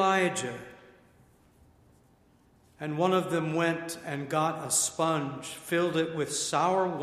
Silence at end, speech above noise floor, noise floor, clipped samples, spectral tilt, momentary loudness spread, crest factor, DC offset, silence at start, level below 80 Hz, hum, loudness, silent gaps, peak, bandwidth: 0 s; 34 dB; -63 dBFS; under 0.1%; -4 dB/octave; 11 LU; 20 dB; under 0.1%; 0 s; -68 dBFS; none; -29 LUFS; none; -12 dBFS; 15.5 kHz